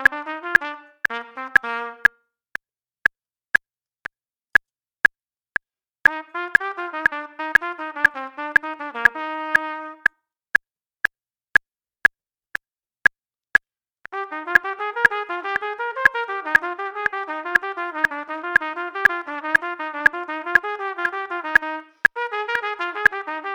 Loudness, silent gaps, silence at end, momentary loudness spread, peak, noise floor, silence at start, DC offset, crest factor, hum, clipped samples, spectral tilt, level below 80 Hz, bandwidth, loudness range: -21 LUFS; none; 0 s; 11 LU; -2 dBFS; -63 dBFS; 0 s; under 0.1%; 22 dB; none; under 0.1%; -3 dB/octave; -60 dBFS; over 20 kHz; 2 LU